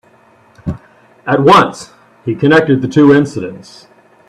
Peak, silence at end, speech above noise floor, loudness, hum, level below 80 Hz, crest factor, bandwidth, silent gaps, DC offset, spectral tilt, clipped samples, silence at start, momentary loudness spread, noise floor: 0 dBFS; 0.7 s; 37 dB; -10 LUFS; none; -46 dBFS; 14 dB; 11.5 kHz; none; under 0.1%; -6.5 dB/octave; under 0.1%; 0.65 s; 19 LU; -47 dBFS